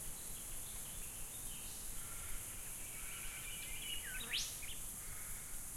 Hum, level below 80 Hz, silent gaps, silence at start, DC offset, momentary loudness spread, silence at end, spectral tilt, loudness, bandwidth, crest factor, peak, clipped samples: none; -54 dBFS; none; 0 s; under 0.1%; 6 LU; 0 s; -0.5 dB/octave; -45 LUFS; 16.5 kHz; 18 dB; -28 dBFS; under 0.1%